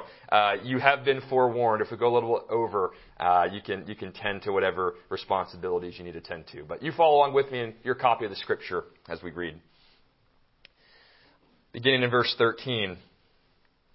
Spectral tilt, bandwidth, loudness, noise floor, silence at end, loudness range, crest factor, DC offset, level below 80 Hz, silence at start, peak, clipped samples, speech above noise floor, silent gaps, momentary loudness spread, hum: -9 dB/octave; 5.8 kHz; -26 LUFS; -66 dBFS; 0.95 s; 7 LU; 26 dB; under 0.1%; -62 dBFS; 0 s; -2 dBFS; under 0.1%; 39 dB; none; 16 LU; none